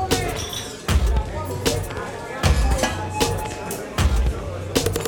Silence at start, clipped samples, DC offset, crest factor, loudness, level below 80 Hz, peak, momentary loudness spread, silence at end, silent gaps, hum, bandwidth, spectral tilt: 0 s; under 0.1%; under 0.1%; 16 dB; -23 LUFS; -26 dBFS; -6 dBFS; 8 LU; 0 s; none; none; 19 kHz; -4.5 dB/octave